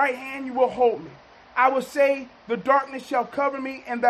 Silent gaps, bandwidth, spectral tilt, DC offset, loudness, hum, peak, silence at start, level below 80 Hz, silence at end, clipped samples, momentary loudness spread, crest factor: none; 13.5 kHz; -5 dB/octave; under 0.1%; -24 LUFS; none; -6 dBFS; 0 s; -64 dBFS; 0 s; under 0.1%; 10 LU; 18 dB